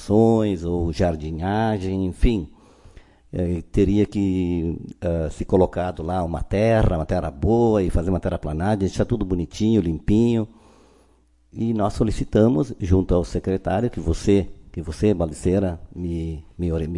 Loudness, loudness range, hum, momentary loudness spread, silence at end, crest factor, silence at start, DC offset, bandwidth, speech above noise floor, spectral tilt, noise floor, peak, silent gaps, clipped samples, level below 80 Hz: -22 LUFS; 3 LU; none; 9 LU; 0 s; 18 dB; 0 s; under 0.1%; 11.5 kHz; 37 dB; -8 dB/octave; -58 dBFS; -4 dBFS; none; under 0.1%; -34 dBFS